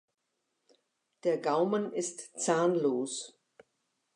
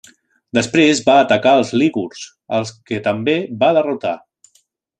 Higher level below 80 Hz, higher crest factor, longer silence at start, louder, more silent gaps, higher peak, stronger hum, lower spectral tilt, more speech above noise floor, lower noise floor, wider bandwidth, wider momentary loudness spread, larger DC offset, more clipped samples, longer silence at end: second, -90 dBFS vs -60 dBFS; about the same, 20 dB vs 16 dB; first, 1.25 s vs 0.55 s; second, -31 LUFS vs -16 LUFS; neither; second, -14 dBFS vs -2 dBFS; neither; about the same, -4.5 dB/octave vs -4.5 dB/octave; first, 51 dB vs 44 dB; first, -82 dBFS vs -60 dBFS; about the same, 11 kHz vs 10 kHz; about the same, 10 LU vs 12 LU; neither; neither; about the same, 0.85 s vs 0.8 s